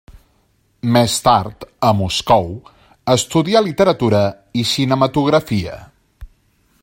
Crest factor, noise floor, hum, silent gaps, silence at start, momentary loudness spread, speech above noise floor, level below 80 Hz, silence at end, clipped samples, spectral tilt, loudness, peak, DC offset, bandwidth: 18 dB; -60 dBFS; none; none; 0.15 s; 13 LU; 44 dB; -44 dBFS; 0.55 s; under 0.1%; -5 dB/octave; -16 LUFS; 0 dBFS; under 0.1%; 16.5 kHz